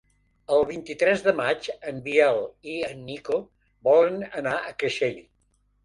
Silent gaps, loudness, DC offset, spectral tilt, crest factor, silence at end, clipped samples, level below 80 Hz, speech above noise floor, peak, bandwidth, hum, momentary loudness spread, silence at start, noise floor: none; -25 LUFS; under 0.1%; -5 dB/octave; 20 dB; 0.65 s; under 0.1%; -62 dBFS; 43 dB; -6 dBFS; 11.5 kHz; none; 12 LU; 0.5 s; -67 dBFS